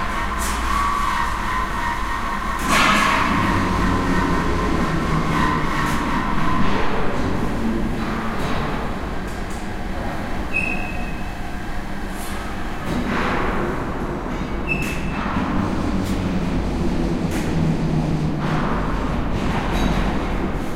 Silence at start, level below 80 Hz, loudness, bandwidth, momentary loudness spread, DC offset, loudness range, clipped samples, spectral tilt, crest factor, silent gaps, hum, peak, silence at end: 0 s; -28 dBFS; -22 LUFS; 16 kHz; 9 LU; under 0.1%; 7 LU; under 0.1%; -5.5 dB/octave; 18 dB; none; none; -4 dBFS; 0 s